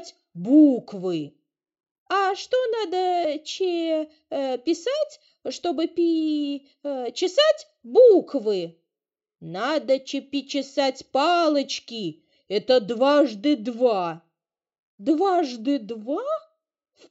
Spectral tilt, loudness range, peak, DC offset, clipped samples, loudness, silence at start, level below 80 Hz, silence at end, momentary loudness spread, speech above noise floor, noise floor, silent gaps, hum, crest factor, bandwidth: -4.5 dB/octave; 5 LU; -6 dBFS; under 0.1%; under 0.1%; -23 LUFS; 0 s; -78 dBFS; 0.7 s; 13 LU; 67 dB; -89 dBFS; 1.91-2.06 s, 14.79-14.98 s; none; 18 dB; 8 kHz